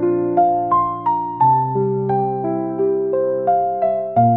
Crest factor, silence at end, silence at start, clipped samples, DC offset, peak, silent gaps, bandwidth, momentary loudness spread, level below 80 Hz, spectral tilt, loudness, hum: 12 dB; 0 s; 0 s; under 0.1%; 0.1%; -4 dBFS; none; 3.8 kHz; 5 LU; -56 dBFS; -12.5 dB/octave; -18 LUFS; none